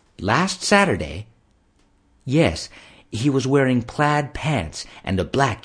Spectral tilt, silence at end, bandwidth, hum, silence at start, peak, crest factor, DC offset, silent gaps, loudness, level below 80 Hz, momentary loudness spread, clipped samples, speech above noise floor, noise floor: -5 dB/octave; 0.05 s; 10.5 kHz; none; 0.2 s; 0 dBFS; 22 dB; under 0.1%; none; -21 LUFS; -44 dBFS; 15 LU; under 0.1%; 39 dB; -60 dBFS